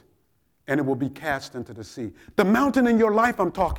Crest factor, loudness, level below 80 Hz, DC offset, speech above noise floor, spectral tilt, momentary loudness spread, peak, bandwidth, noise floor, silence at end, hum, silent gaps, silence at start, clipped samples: 16 dB; -22 LUFS; -46 dBFS; under 0.1%; 46 dB; -6.5 dB/octave; 17 LU; -6 dBFS; 17 kHz; -69 dBFS; 0 s; none; none; 0.7 s; under 0.1%